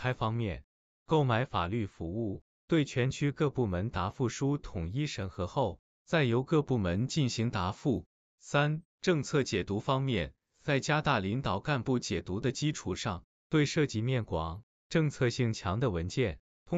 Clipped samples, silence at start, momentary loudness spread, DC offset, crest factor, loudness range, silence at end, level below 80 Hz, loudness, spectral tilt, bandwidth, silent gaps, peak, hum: under 0.1%; 0 s; 8 LU; under 0.1%; 18 dB; 1 LU; 0 s; -54 dBFS; -32 LUFS; -6 dB/octave; 8.2 kHz; 0.64-1.06 s, 2.41-2.68 s, 5.79-6.05 s, 8.06-8.38 s, 8.85-8.98 s, 13.24-13.50 s, 14.63-14.90 s, 16.39-16.66 s; -14 dBFS; none